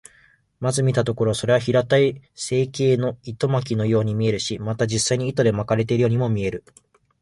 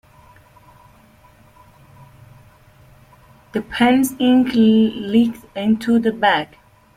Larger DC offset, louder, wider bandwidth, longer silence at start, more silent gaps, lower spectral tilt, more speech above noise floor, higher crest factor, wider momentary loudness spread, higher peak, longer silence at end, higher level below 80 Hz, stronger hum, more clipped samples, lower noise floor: neither; second, -21 LUFS vs -17 LUFS; second, 11.5 kHz vs 15.5 kHz; second, 0.6 s vs 3.55 s; neither; about the same, -5.5 dB/octave vs -5.5 dB/octave; about the same, 36 dB vs 34 dB; about the same, 16 dB vs 16 dB; second, 7 LU vs 11 LU; second, -6 dBFS vs -2 dBFS; about the same, 0.6 s vs 0.5 s; about the same, -52 dBFS vs -54 dBFS; neither; neither; first, -57 dBFS vs -50 dBFS